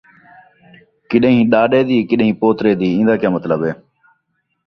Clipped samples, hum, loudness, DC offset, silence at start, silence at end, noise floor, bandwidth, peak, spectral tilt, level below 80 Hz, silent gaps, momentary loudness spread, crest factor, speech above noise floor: under 0.1%; none; -15 LUFS; under 0.1%; 1.1 s; 0.95 s; -68 dBFS; 6 kHz; 0 dBFS; -9 dB/octave; -54 dBFS; none; 7 LU; 16 dB; 54 dB